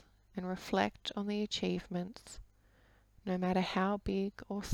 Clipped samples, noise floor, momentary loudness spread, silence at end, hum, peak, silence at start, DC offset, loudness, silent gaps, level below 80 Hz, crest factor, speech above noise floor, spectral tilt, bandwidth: under 0.1%; -66 dBFS; 14 LU; 0 s; none; -18 dBFS; 0.35 s; under 0.1%; -36 LUFS; none; -58 dBFS; 20 dB; 30 dB; -5.5 dB/octave; 15.5 kHz